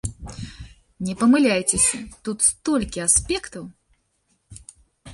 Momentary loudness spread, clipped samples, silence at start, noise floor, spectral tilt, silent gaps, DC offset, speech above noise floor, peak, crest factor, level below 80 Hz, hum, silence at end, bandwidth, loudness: 20 LU; under 0.1%; 0.05 s; -68 dBFS; -3 dB/octave; none; under 0.1%; 47 dB; -4 dBFS; 20 dB; -44 dBFS; none; 0 s; 11.5 kHz; -20 LUFS